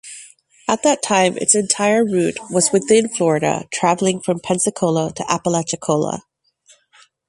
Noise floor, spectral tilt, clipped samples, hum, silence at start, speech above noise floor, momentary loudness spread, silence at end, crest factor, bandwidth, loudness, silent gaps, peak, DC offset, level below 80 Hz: -54 dBFS; -4 dB/octave; under 0.1%; none; 0.05 s; 37 dB; 8 LU; 1.1 s; 18 dB; 11.5 kHz; -17 LUFS; none; 0 dBFS; under 0.1%; -58 dBFS